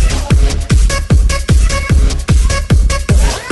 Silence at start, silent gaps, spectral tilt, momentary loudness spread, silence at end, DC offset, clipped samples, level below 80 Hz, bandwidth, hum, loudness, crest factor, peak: 0 s; none; -5 dB/octave; 1 LU; 0 s; under 0.1%; under 0.1%; -12 dBFS; 12 kHz; none; -13 LUFS; 10 dB; 0 dBFS